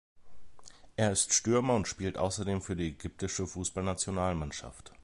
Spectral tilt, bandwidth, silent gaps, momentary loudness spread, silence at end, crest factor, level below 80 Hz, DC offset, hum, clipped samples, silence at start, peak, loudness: -4 dB/octave; 11.5 kHz; none; 13 LU; 0.1 s; 20 dB; -50 dBFS; under 0.1%; none; under 0.1%; 0.15 s; -12 dBFS; -32 LUFS